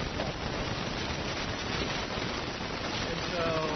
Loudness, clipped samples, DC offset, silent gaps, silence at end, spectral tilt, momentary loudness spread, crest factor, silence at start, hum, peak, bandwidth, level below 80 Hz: -33 LUFS; under 0.1%; under 0.1%; none; 0 s; -3 dB/octave; 3 LU; 16 dB; 0 s; none; -16 dBFS; 6.4 kHz; -46 dBFS